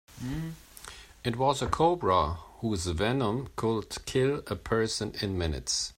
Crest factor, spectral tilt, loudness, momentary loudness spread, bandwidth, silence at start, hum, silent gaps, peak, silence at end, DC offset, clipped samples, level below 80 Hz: 20 dB; -4.5 dB/octave; -30 LUFS; 11 LU; 16 kHz; 0.1 s; none; none; -10 dBFS; 0.05 s; under 0.1%; under 0.1%; -48 dBFS